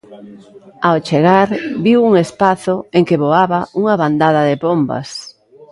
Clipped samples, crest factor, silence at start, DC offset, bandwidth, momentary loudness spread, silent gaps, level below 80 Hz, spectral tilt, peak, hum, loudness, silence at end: under 0.1%; 14 dB; 0.1 s; under 0.1%; 11.5 kHz; 7 LU; none; -56 dBFS; -7 dB/octave; 0 dBFS; none; -14 LUFS; 0.4 s